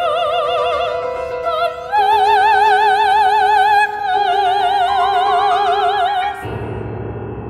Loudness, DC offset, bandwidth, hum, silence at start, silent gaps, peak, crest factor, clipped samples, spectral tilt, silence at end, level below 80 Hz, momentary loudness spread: -15 LUFS; under 0.1%; 13.5 kHz; none; 0 s; none; -2 dBFS; 14 dB; under 0.1%; -4 dB/octave; 0 s; -44 dBFS; 13 LU